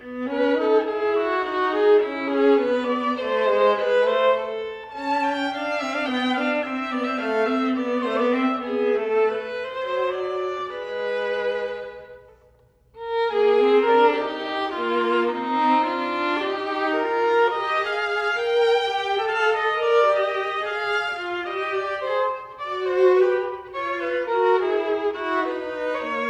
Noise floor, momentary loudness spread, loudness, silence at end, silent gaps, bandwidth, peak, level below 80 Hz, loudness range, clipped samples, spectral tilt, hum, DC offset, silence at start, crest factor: -57 dBFS; 9 LU; -22 LUFS; 0 s; none; 9.4 kHz; -8 dBFS; -62 dBFS; 4 LU; under 0.1%; -4 dB/octave; none; under 0.1%; 0 s; 16 dB